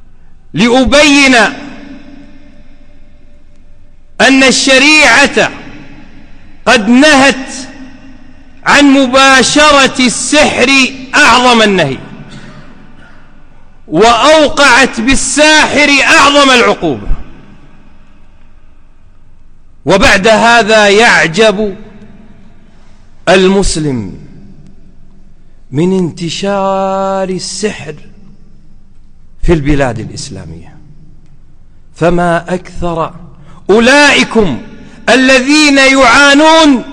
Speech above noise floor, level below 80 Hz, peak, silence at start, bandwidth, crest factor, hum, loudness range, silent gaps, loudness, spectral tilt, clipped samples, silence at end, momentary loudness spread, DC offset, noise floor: 27 dB; -28 dBFS; 0 dBFS; 0 s; 13 kHz; 10 dB; none; 11 LU; none; -6 LUFS; -3 dB/octave; 0.3%; 0 s; 16 LU; under 0.1%; -34 dBFS